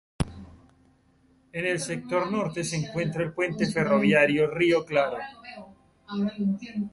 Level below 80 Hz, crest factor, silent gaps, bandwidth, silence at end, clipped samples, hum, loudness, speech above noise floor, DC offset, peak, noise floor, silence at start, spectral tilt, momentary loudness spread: -50 dBFS; 20 dB; none; 11.5 kHz; 0.05 s; under 0.1%; none; -26 LUFS; 36 dB; under 0.1%; -8 dBFS; -62 dBFS; 0.2 s; -5.5 dB/octave; 16 LU